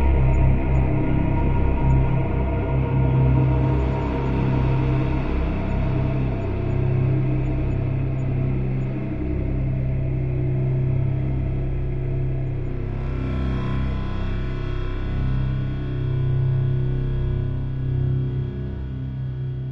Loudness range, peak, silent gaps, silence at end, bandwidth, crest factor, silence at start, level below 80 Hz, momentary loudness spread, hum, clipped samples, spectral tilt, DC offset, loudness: 5 LU; -6 dBFS; none; 0 s; 4.5 kHz; 14 dB; 0 s; -26 dBFS; 8 LU; none; under 0.1%; -10.5 dB/octave; 1%; -23 LUFS